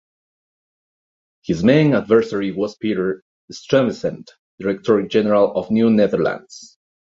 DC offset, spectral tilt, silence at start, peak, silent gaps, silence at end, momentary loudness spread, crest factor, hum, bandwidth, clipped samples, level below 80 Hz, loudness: under 0.1%; -7 dB/octave; 1.5 s; -2 dBFS; 3.22-3.48 s, 4.39-4.58 s; 0.55 s; 17 LU; 18 dB; none; 7.8 kHz; under 0.1%; -54 dBFS; -18 LUFS